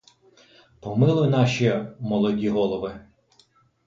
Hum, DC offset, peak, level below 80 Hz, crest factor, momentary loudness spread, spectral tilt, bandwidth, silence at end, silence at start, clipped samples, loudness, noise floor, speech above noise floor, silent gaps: none; under 0.1%; -8 dBFS; -56 dBFS; 16 dB; 11 LU; -7.5 dB/octave; 7.6 kHz; 0.85 s; 0.85 s; under 0.1%; -23 LUFS; -61 dBFS; 39 dB; none